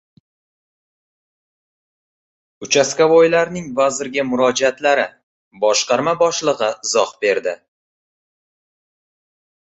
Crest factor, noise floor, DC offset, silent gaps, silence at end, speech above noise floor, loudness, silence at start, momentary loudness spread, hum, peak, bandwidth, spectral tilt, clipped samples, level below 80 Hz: 18 dB; under -90 dBFS; under 0.1%; 5.23-5.51 s; 2.1 s; over 74 dB; -17 LUFS; 2.6 s; 9 LU; none; -2 dBFS; 8.2 kHz; -2.5 dB/octave; under 0.1%; -62 dBFS